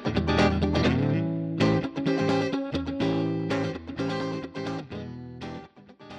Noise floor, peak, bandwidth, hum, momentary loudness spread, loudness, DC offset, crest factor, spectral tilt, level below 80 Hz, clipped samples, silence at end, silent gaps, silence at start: -48 dBFS; -10 dBFS; 9.4 kHz; none; 15 LU; -27 LUFS; under 0.1%; 16 dB; -7 dB/octave; -44 dBFS; under 0.1%; 0 s; none; 0 s